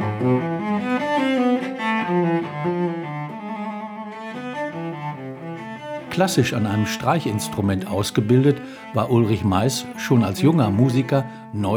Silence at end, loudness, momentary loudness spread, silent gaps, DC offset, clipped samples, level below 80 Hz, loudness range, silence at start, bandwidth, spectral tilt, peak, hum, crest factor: 0 s; -22 LUFS; 14 LU; none; under 0.1%; under 0.1%; -60 dBFS; 9 LU; 0 s; over 20 kHz; -6 dB/octave; -4 dBFS; none; 18 dB